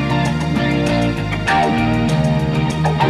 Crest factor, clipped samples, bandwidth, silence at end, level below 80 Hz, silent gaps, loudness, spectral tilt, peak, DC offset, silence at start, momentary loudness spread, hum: 14 dB; under 0.1%; 12.5 kHz; 0 s; -32 dBFS; none; -17 LUFS; -6.5 dB/octave; -4 dBFS; under 0.1%; 0 s; 3 LU; none